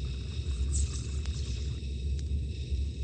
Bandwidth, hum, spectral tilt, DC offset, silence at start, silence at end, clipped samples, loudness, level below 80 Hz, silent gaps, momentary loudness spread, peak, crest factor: 9.4 kHz; none; -5 dB/octave; under 0.1%; 0 s; 0 s; under 0.1%; -35 LUFS; -34 dBFS; none; 5 LU; -18 dBFS; 14 dB